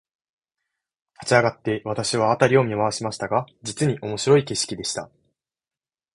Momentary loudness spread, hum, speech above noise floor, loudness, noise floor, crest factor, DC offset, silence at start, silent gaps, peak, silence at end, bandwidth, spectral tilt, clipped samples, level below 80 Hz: 10 LU; none; over 68 dB; -22 LUFS; under -90 dBFS; 22 dB; under 0.1%; 1.2 s; none; -2 dBFS; 1.1 s; 11.5 kHz; -4.5 dB/octave; under 0.1%; -58 dBFS